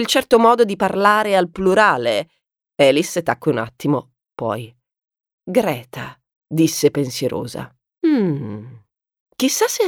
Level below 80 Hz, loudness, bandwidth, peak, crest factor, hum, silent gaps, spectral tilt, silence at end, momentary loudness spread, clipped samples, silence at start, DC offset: -56 dBFS; -18 LUFS; 18.5 kHz; 0 dBFS; 18 dB; none; 5.33-5.38 s, 6.36-6.41 s, 9.20-9.26 s; -4.5 dB/octave; 0 s; 18 LU; under 0.1%; 0 s; under 0.1%